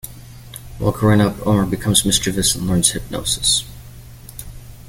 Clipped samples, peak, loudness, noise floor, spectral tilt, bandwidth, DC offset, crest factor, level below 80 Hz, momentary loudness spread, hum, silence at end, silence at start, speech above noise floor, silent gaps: under 0.1%; 0 dBFS; -17 LUFS; -38 dBFS; -3.5 dB/octave; 17 kHz; under 0.1%; 20 dB; -36 dBFS; 21 LU; none; 0 s; 0.05 s; 21 dB; none